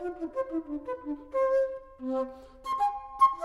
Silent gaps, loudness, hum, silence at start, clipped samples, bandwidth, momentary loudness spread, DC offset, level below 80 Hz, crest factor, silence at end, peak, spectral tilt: none; -31 LUFS; none; 0 s; under 0.1%; 12 kHz; 11 LU; under 0.1%; -58 dBFS; 18 dB; 0 s; -12 dBFS; -5.5 dB/octave